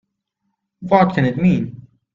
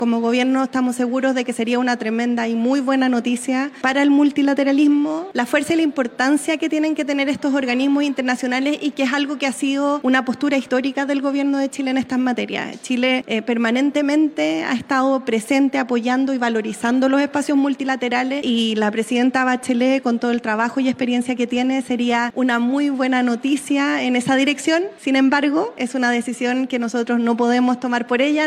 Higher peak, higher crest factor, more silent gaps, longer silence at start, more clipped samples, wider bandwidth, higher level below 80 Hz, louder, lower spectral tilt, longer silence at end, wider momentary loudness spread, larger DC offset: about the same, 0 dBFS vs -2 dBFS; about the same, 18 dB vs 16 dB; neither; first, 0.8 s vs 0 s; neither; second, 7 kHz vs 13 kHz; first, -50 dBFS vs -68 dBFS; about the same, -17 LUFS vs -19 LUFS; first, -9 dB/octave vs -4 dB/octave; first, 0.4 s vs 0 s; first, 15 LU vs 4 LU; neither